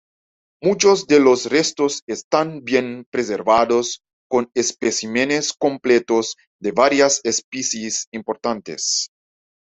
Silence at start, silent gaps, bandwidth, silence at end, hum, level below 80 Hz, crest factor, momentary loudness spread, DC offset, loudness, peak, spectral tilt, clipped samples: 0.6 s; 2.02-2.07 s, 2.24-2.31 s, 3.06-3.12 s, 4.13-4.30 s, 6.47-6.59 s, 7.44-7.52 s, 8.07-8.12 s; 8.4 kHz; 0.55 s; none; -60 dBFS; 18 dB; 10 LU; under 0.1%; -19 LUFS; 0 dBFS; -2.5 dB/octave; under 0.1%